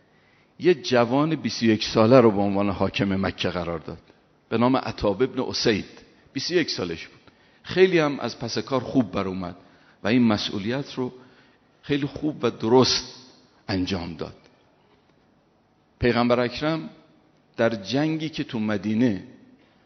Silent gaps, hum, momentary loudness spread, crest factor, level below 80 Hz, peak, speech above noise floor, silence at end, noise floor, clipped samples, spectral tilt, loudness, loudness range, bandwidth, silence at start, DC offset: none; none; 15 LU; 22 dB; -52 dBFS; -2 dBFS; 39 dB; 0.6 s; -62 dBFS; under 0.1%; -4.5 dB/octave; -23 LUFS; 6 LU; 6.4 kHz; 0.6 s; under 0.1%